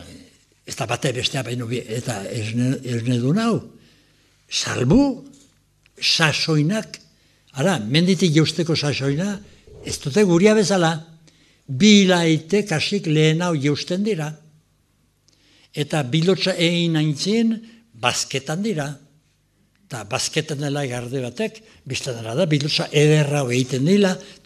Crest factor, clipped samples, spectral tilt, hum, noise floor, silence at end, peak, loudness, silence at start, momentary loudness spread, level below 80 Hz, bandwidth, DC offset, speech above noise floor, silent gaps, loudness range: 20 dB; under 0.1%; -5 dB/octave; 50 Hz at -50 dBFS; -63 dBFS; 0.15 s; 0 dBFS; -20 LUFS; 0 s; 12 LU; -52 dBFS; 13.5 kHz; under 0.1%; 43 dB; none; 7 LU